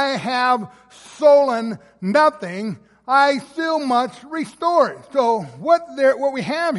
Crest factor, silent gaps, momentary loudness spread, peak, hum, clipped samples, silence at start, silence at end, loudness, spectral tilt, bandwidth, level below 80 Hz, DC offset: 16 dB; none; 13 LU; -2 dBFS; none; under 0.1%; 0 s; 0 s; -19 LUFS; -5 dB/octave; 11.5 kHz; -68 dBFS; under 0.1%